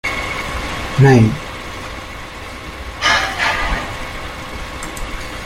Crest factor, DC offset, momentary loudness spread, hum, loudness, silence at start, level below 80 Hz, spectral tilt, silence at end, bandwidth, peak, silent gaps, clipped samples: 18 dB; under 0.1%; 17 LU; none; -18 LUFS; 0.05 s; -32 dBFS; -5 dB/octave; 0 s; 16 kHz; -2 dBFS; none; under 0.1%